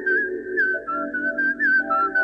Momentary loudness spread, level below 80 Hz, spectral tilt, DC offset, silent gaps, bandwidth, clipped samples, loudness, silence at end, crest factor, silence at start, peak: 7 LU; -60 dBFS; -6 dB/octave; under 0.1%; none; 5.6 kHz; under 0.1%; -21 LUFS; 0 s; 10 dB; 0 s; -12 dBFS